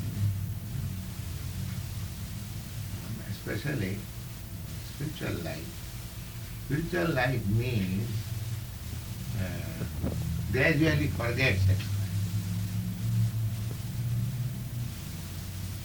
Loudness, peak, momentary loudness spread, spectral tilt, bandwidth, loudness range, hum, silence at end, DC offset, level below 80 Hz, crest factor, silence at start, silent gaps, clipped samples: -32 LUFS; -12 dBFS; 12 LU; -6 dB/octave; over 20 kHz; 8 LU; none; 0 s; under 0.1%; -44 dBFS; 20 dB; 0 s; none; under 0.1%